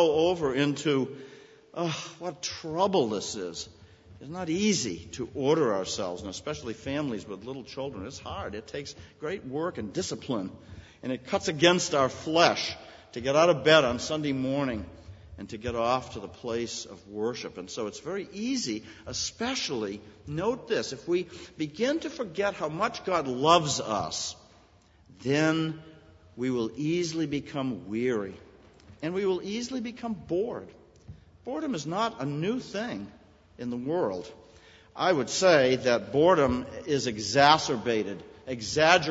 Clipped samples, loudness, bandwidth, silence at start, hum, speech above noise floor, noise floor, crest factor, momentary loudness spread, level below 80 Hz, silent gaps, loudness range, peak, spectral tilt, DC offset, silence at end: under 0.1%; -28 LUFS; 8 kHz; 0 s; none; 31 dB; -59 dBFS; 26 dB; 17 LU; -58 dBFS; none; 10 LU; -4 dBFS; -4 dB/octave; under 0.1%; 0 s